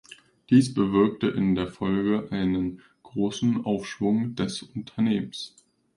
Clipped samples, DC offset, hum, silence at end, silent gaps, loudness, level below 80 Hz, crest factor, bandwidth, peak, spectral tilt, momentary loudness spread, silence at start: under 0.1%; under 0.1%; none; 0.5 s; none; -25 LUFS; -54 dBFS; 18 dB; 11.5 kHz; -8 dBFS; -6.5 dB/octave; 13 LU; 0.1 s